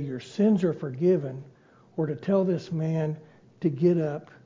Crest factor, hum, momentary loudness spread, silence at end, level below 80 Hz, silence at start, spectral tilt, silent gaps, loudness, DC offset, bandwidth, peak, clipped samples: 16 dB; none; 12 LU; 0.2 s; -68 dBFS; 0 s; -9 dB/octave; none; -26 LUFS; under 0.1%; 7.6 kHz; -12 dBFS; under 0.1%